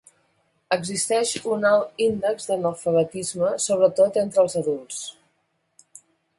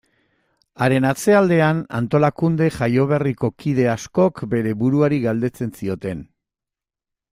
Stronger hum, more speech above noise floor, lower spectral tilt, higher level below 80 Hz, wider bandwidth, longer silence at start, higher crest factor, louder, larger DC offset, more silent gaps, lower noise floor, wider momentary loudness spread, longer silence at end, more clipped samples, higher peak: neither; second, 49 dB vs 69 dB; second, -3.5 dB/octave vs -7 dB/octave; second, -66 dBFS vs -52 dBFS; second, 11.5 kHz vs 15.5 kHz; about the same, 0.7 s vs 0.8 s; about the same, 18 dB vs 16 dB; second, -22 LUFS vs -19 LUFS; neither; neither; second, -71 dBFS vs -87 dBFS; second, 7 LU vs 10 LU; first, 1.3 s vs 1.05 s; neither; second, -6 dBFS vs -2 dBFS